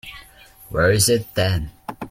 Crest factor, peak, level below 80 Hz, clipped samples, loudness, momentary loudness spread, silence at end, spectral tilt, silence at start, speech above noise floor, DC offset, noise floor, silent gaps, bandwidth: 18 dB; -2 dBFS; -40 dBFS; under 0.1%; -19 LUFS; 18 LU; 0 s; -4 dB/octave; 0.05 s; 28 dB; under 0.1%; -46 dBFS; none; 16.5 kHz